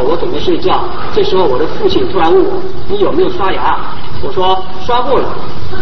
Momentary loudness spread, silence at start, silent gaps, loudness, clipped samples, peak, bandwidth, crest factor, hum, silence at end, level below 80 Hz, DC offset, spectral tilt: 9 LU; 0 s; none; -14 LUFS; 0.1%; 0 dBFS; 6.2 kHz; 14 dB; none; 0 s; -32 dBFS; 40%; -7 dB/octave